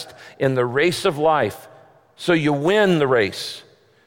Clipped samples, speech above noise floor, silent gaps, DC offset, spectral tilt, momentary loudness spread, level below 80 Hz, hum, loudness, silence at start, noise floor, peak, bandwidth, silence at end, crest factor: under 0.1%; 31 dB; none; under 0.1%; -5.5 dB/octave; 14 LU; -60 dBFS; none; -19 LUFS; 0 s; -49 dBFS; -6 dBFS; 17 kHz; 0.45 s; 14 dB